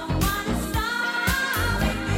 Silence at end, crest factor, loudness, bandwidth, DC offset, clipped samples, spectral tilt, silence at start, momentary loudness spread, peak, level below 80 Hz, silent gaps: 0 s; 16 dB; -24 LUFS; 16.5 kHz; under 0.1%; under 0.1%; -4 dB/octave; 0 s; 3 LU; -8 dBFS; -32 dBFS; none